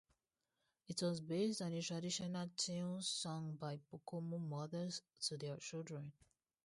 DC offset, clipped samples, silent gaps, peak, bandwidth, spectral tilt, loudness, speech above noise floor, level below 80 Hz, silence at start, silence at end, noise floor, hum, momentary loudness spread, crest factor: under 0.1%; under 0.1%; none; -28 dBFS; 11.5 kHz; -4.5 dB/octave; -44 LUFS; 45 dB; -84 dBFS; 0.9 s; 0.55 s; -90 dBFS; none; 8 LU; 18 dB